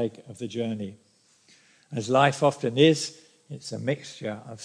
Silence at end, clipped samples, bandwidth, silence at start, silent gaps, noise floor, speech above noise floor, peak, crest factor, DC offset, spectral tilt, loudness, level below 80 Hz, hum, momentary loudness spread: 0 s; under 0.1%; 10.5 kHz; 0 s; none; -60 dBFS; 35 dB; -6 dBFS; 20 dB; under 0.1%; -5 dB/octave; -26 LUFS; -76 dBFS; none; 17 LU